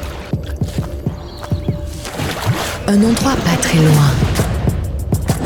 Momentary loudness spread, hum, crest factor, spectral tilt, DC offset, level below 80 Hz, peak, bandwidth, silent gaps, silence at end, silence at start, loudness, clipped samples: 12 LU; none; 14 dB; -5.5 dB/octave; under 0.1%; -26 dBFS; -2 dBFS; 18 kHz; none; 0 s; 0 s; -17 LUFS; under 0.1%